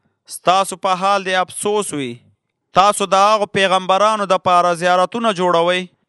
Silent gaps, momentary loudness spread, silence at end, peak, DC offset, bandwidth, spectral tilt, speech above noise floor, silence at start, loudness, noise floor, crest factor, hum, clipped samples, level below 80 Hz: none; 6 LU; 0.25 s; 0 dBFS; under 0.1%; 12 kHz; -3.5 dB/octave; 43 dB; 0.3 s; -16 LUFS; -59 dBFS; 16 dB; none; under 0.1%; -60 dBFS